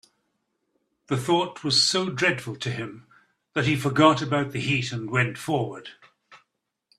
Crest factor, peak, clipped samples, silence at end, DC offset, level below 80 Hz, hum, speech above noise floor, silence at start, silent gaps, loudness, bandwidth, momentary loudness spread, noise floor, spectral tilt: 24 dB; -2 dBFS; under 0.1%; 0.6 s; under 0.1%; -62 dBFS; none; 51 dB; 1.1 s; none; -24 LUFS; 13.5 kHz; 13 LU; -75 dBFS; -4.5 dB/octave